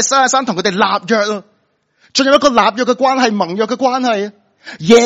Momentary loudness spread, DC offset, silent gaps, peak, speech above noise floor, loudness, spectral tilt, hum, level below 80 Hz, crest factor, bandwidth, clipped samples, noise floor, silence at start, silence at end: 9 LU; under 0.1%; none; 0 dBFS; 48 dB; -13 LUFS; -3 dB/octave; none; -54 dBFS; 14 dB; 9.8 kHz; 0.2%; -60 dBFS; 0 s; 0 s